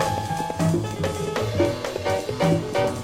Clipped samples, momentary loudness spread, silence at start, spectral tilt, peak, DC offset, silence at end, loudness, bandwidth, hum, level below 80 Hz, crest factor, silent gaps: under 0.1%; 5 LU; 0 s; -6 dB/octave; -8 dBFS; under 0.1%; 0 s; -24 LUFS; 16 kHz; none; -48 dBFS; 16 dB; none